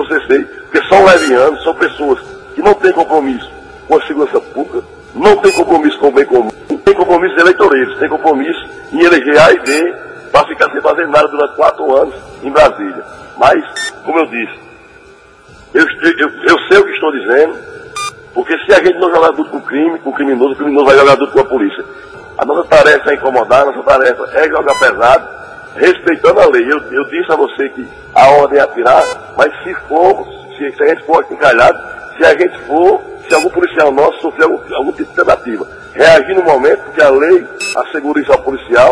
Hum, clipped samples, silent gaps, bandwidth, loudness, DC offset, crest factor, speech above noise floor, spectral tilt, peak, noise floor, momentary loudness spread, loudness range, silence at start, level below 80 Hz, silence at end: none; 2%; none; 11 kHz; -10 LUFS; under 0.1%; 10 dB; 30 dB; -4.5 dB/octave; 0 dBFS; -40 dBFS; 13 LU; 3 LU; 0 s; -42 dBFS; 0 s